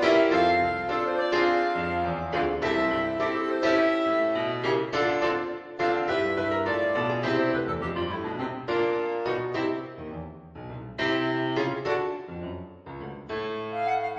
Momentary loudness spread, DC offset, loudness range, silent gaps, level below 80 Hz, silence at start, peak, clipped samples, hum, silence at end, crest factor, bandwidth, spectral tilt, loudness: 15 LU; under 0.1%; 5 LU; none; -54 dBFS; 0 s; -8 dBFS; under 0.1%; none; 0 s; 18 dB; 8 kHz; -6 dB/octave; -26 LUFS